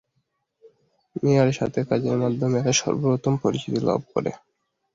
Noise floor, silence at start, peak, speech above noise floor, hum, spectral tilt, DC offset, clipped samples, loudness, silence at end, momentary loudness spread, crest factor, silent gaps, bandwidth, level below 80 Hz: -74 dBFS; 0.65 s; -6 dBFS; 51 dB; none; -5.5 dB/octave; under 0.1%; under 0.1%; -23 LUFS; 0.6 s; 8 LU; 18 dB; none; 7.8 kHz; -58 dBFS